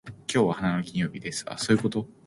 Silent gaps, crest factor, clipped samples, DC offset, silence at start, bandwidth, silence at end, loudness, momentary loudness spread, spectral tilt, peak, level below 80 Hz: none; 18 dB; under 0.1%; under 0.1%; 0.05 s; 11.5 kHz; 0.15 s; -27 LUFS; 7 LU; -5 dB/octave; -8 dBFS; -58 dBFS